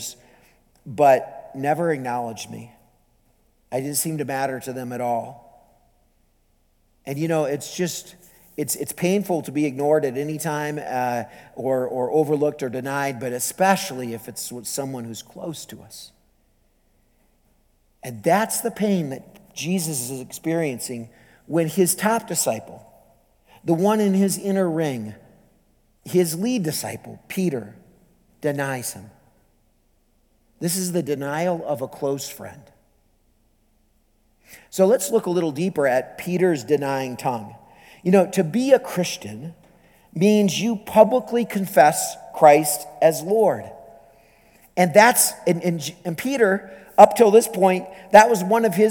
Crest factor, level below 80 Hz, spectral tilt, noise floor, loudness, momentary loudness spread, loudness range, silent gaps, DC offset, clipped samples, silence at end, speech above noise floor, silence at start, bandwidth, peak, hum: 22 dB; -64 dBFS; -4.5 dB/octave; -63 dBFS; -21 LUFS; 17 LU; 11 LU; none; under 0.1%; under 0.1%; 0 s; 42 dB; 0 s; 19.5 kHz; 0 dBFS; none